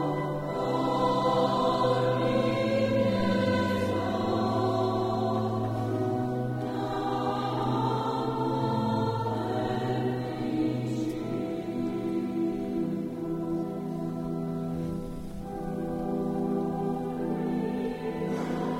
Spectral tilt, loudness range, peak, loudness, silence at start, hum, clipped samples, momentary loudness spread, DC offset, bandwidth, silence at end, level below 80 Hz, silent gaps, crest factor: -7.5 dB/octave; 6 LU; -14 dBFS; -29 LUFS; 0 s; none; under 0.1%; 7 LU; under 0.1%; 16 kHz; 0 s; -52 dBFS; none; 14 dB